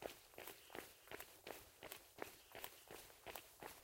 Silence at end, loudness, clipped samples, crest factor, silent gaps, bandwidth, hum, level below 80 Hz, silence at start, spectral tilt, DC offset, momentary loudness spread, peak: 0 s; -56 LUFS; under 0.1%; 30 dB; none; 16.5 kHz; none; -78 dBFS; 0 s; -2 dB/octave; under 0.1%; 2 LU; -28 dBFS